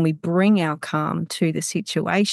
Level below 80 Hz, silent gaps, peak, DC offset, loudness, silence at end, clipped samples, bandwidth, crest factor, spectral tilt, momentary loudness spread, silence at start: -68 dBFS; none; -6 dBFS; under 0.1%; -22 LUFS; 0 s; under 0.1%; 12.5 kHz; 14 dB; -5.5 dB/octave; 6 LU; 0 s